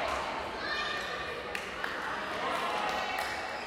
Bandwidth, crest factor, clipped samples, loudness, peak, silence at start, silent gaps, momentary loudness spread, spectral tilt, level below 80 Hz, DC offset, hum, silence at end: 16.5 kHz; 18 dB; under 0.1%; -34 LUFS; -16 dBFS; 0 s; none; 4 LU; -2.5 dB/octave; -58 dBFS; under 0.1%; none; 0 s